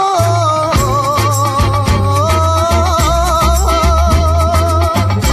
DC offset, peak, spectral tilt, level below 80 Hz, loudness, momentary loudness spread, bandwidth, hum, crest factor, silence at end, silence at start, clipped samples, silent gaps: under 0.1%; 0 dBFS; -5 dB/octave; -18 dBFS; -12 LUFS; 1 LU; 14 kHz; none; 12 dB; 0 s; 0 s; under 0.1%; none